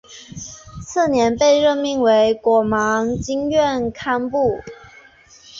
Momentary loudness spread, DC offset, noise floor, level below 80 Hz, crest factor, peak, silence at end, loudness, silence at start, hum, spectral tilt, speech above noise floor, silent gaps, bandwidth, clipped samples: 19 LU; under 0.1%; -47 dBFS; -46 dBFS; 14 dB; -4 dBFS; 0 s; -18 LUFS; 0.1 s; none; -4.5 dB/octave; 30 dB; none; 7.8 kHz; under 0.1%